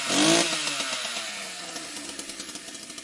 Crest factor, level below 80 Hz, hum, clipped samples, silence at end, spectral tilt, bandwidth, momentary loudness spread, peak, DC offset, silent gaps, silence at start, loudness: 20 dB; -66 dBFS; none; under 0.1%; 0 s; -1.5 dB/octave; 12 kHz; 16 LU; -8 dBFS; under 0.1%; none; 0 s; -26 LUFS